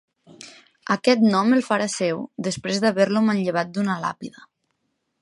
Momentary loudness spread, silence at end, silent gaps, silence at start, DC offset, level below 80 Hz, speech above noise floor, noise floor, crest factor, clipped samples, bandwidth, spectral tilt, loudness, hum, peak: 20 LU; 0.9 s; none; 0.4 s; under 0.1%; -68 dBFS; 53 dB; -74 dBFS; 18 dB; under 0.1%; 11.5 kHz; -5 dB/octave; -21 LUFS; none; -4 dBFS